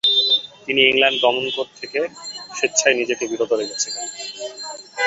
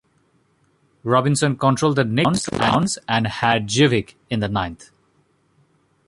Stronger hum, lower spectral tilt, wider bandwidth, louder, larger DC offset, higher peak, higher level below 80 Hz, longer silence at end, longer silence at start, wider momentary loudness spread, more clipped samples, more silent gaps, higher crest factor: neither; second, -0.5 dB/octave vs -5 dB/octave; second, 8.4 kHz vs 11.5 kHz; about the same, -19 LUFS vs -19 LUFS; neither; about the same, -2 dBFS vs -2 dBFS; second, -66 dBFS vs -48 dBFS; second, 0 s vs 1.25 s; second, 0.05 s vs 1.05 s; first, 16 LU vs 8 LU; neither; neither; about the same, 20 dB vs 18 dB